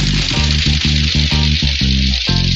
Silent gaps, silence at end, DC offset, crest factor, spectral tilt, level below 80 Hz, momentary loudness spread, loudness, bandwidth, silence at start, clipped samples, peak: none; 0 s; under 0.1%; 12 dB; -4 dB/octave; -18 dBFS; 1 LU; -14 LUFS; 8.2 kHz; 0 s; under 0.1%; -2 dBFS